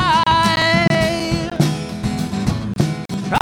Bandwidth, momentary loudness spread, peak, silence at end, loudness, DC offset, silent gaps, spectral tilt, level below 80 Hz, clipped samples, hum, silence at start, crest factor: 17 kHz; 9 LU; -2 dBFS; 0 s; -18 LUFS; under 0.1%; none; -5 dB/octave; -36 dBFS; under 0.1%; none; 0 s; 16 dB